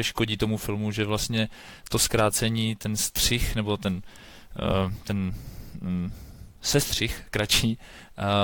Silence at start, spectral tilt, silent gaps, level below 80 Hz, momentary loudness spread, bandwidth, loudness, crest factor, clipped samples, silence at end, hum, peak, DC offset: 0 s; -4 dB/octave; none; -40 dBFS; 14 LU; 18 kHz; -26 LUFS; 18 dB; under 0.1%; 0 s; none; -10 dBFS; under 0.1%